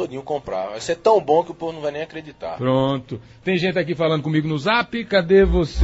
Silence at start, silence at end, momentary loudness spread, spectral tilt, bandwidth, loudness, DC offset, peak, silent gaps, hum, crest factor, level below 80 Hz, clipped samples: 0 s; 0 s; 13 LU; -6.5 dB/octave; 8 kHz; -20 LUFS; under 0.1%; -4 dBFS; none; none; 16 dB; -36 dBFS; under 0.1%